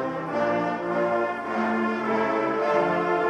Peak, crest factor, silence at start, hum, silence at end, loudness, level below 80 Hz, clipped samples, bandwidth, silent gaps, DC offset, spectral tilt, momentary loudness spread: -10 dBFS; 16 dB; 0 s; none; 0 s; -25 LUFS; -64 dBFS; under 0.1%; 9.8 kHz; none; under 0.1%; -6.5 dB/octave; 4 LU